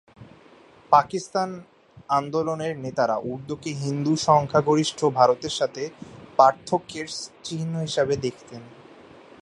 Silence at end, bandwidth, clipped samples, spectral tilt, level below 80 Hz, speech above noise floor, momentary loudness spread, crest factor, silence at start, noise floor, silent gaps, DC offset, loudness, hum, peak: 0.6 s; 11.5 kHz; under 0.1%; -5 dB/octave; -60 dBFS; 28 dB; 14 LU; 22 dB; 0.2 s; -52 dBFS; none; under 0.1%; -24 LUFS; none; -2 dBFS